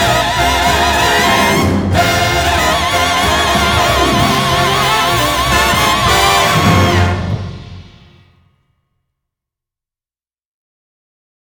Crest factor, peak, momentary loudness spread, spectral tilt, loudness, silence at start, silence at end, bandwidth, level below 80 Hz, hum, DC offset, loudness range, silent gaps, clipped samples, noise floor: 14 dB; 0 dBFS; 3 LU; -3.5 dB/octave; -11 LUFS; 0 s; 3.65 s; over 20 kHz; -28 dBFS; none; under 0.1%; 7 LU; none; under 0.1%; under -90 dBFS